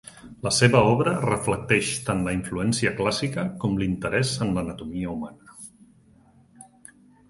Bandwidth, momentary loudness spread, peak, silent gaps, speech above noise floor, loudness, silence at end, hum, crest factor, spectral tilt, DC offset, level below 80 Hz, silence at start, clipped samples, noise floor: 11.5 kHz; 18 LU; -4 dBFS; none; 32 dB; -24 LUFS; 0.65 s; none; 22 dB; -5 dB/octave; under 0.1%; -48 dBFS; 0.05 s; under 0.1%; -56 dBFS